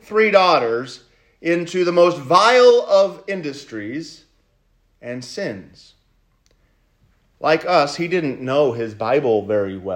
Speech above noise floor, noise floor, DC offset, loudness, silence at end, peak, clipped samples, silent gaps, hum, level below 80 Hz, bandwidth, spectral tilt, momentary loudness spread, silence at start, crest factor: 44 dB; -61 dBFS; under 0.1%; -17 LUFS; 0 s; 0 dBFS; under 0.1%; none; none; -62 dBFS; 10 kHz; -5 dB/octave; 18 LU; 0.1 s; 18 dB